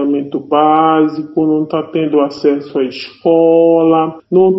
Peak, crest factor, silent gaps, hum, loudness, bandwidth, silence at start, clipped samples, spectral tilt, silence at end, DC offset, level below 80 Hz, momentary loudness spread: 0 dBFS; 12 dB; none; none; -13 LUFS; 6 kHz; 0 s; under 0.1%; -8.5 dB/octave; 0 s; under 0.1%; -60 dBFS; 9 LU